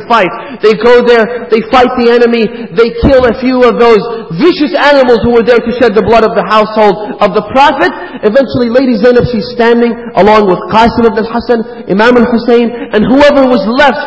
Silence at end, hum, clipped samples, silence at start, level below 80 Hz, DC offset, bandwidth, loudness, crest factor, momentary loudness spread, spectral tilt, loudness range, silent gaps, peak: 0 s; none; 4%; 0 s; -30 dBFS; 0.6%; 8 kHz; -7 LUFS; 6 dB; 6 LU; -6.5 dB/octave; 1 LU; none; 0 dBFS